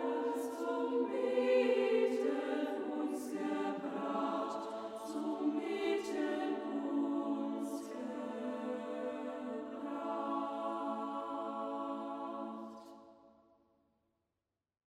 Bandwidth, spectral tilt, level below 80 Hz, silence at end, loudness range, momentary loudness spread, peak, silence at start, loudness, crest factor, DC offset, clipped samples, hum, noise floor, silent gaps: 15.5 kHz; -5 dB/octave; -84 dBFS; 1.6 s; 8 LU; 10 LU; -20 dBFS; 0 s; -38 LUFS; 18 dB; under 0.1%; under 0.1%; none; under -90 dBFS; none